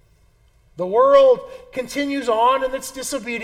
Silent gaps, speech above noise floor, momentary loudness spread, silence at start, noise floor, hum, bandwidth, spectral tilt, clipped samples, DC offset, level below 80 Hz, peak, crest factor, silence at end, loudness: none; 38 dB; 16 LU; 0.8 s; -56 dBFS; none; 15.5 kHz; -3.5 dB/octave; under 0.1%; under 0.1%; -52 dBFS; -4 dBFS; 16 dB; 0 s; -18 LUFS